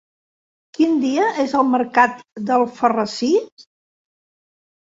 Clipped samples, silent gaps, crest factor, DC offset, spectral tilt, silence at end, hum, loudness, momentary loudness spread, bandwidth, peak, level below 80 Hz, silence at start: under 0.1%; 3.52-3.57 s; 18 dB; under 0.1%; -4.5 dB/octave; 1.25 s; none; -18 LUFS; 4 LU; 7.8 kHz; -2 dBFS; -66 dBFS; 0.8 s